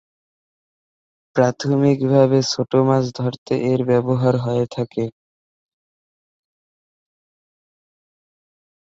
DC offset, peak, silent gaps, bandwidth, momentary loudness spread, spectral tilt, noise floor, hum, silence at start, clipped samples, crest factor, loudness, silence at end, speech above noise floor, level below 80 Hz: under 0.1%; -2 dBFS; 3.38-3.46 s; 7.8 kHz; 9 LU; -7 dB/octave; under -90 dBFS; none; 1.35 s; under 0.1%; 20 dB; -19 LUFS; 3.7 s; over 72 dB; -60 dBFS